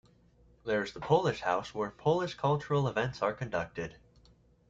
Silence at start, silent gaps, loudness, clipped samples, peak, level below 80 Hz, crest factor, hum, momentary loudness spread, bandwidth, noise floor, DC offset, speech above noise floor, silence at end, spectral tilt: 0.65 s; none; -32 LUFS; under 0.1%; -14 dBFS; -62 dBFS; 18 dB; none; 10 LU; 7.8 kHz; -63 dBFS; under 0.1%; 32 dB; 0.75 s; -6.5 dB/octave